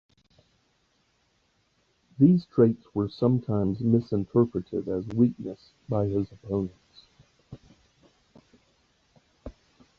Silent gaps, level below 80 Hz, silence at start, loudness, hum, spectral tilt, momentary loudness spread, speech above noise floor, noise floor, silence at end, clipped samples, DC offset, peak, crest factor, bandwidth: none; -56 dBFS; 2.2 s; -26 LUFS; none; -11 dB/octave; 18 LU; 45 dB; -70 dBFS; 0.45 s; under 0.1%; under 0.1%; -8 dBFS; 20 dB; 6.6 kHz